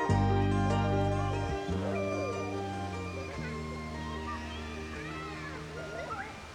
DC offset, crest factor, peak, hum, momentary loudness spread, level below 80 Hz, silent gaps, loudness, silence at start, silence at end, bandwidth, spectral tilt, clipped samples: under 0.1%; 18 dB; -16 dBFS; none; 11 LU; -46 dBFS; none; -34 LUFS; 0 s; 0 s; 10.5 kHz; -6.5 dB/octave; under 0.1%